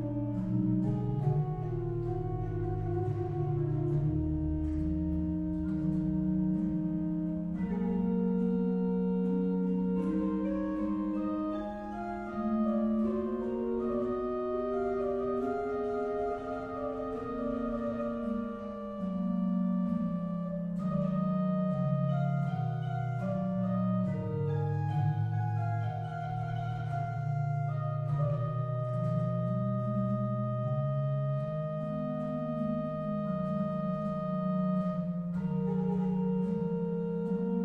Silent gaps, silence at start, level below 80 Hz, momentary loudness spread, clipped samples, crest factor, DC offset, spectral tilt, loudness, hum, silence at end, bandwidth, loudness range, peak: none; 0 s; -48 dBFS; 5 LU; under 0.1%; 14 dB; under 0.1%; -11 dB/octave; -33 LUFS; none; 0 s; 4.6 kHz; 2 LU; -18 dBFS